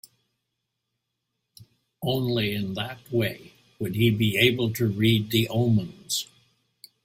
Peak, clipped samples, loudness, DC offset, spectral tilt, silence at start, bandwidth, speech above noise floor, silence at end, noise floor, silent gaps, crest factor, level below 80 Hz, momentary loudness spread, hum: -4 dBFS; under 0.1%; -25 LUFS; under 0.1%; -5 dB/octave; 1.6 s; 16.5 kHz; 57 dB; 0.8 s; -81 dBFS; none; 22 dB; -56 dBFS; 11 LU; none